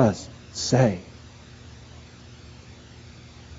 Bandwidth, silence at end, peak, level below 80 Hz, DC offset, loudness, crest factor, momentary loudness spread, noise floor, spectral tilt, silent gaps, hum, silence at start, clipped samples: 8 kHz; 0 s; -4 dBFS; -52 dBFS; under 0.1%; -24 LUFS; 22 dB; 25 LU; -46 dBFS; -6 dB/octave; none; none; 0 s; under 0.1%